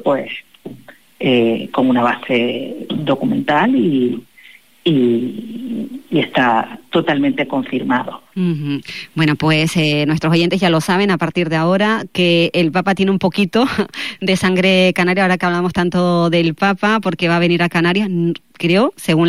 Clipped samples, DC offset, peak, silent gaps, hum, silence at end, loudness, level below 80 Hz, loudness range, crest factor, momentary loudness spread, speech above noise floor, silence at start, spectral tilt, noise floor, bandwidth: under 0.1%; 0.5%; -4 dBFS; none; none; 0 s; -16 LUFS; -54 dBFS; 3 LU; 12 dB; 9 LU; 30 dB; 0 s; -6 dB/octave; -45 dBFS; 15 kHz